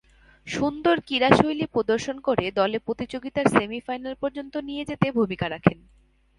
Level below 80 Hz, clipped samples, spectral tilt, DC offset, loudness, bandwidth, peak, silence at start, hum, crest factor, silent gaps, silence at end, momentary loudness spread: -52 dBFS; under 0.1%; -6 dB/octave; under 0.1%; -24 LUFS; 11.5 kHz; 0 dBFS; 0.45 s; none; 24 dB; none; 0.65 s; 12 LU